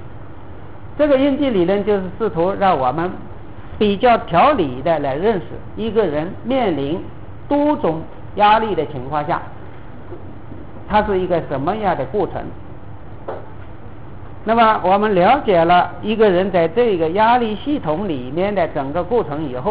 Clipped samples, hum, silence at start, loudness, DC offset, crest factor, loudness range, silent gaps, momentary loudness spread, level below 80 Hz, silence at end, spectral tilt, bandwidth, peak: under 0.1%; none; 0 s; -17 LUFS; 2%; 14 dB; 7 LU; none; 23 LU; -40 dBFS; 0 s; -10 dB/octave; 4 kHz; -4 dBFS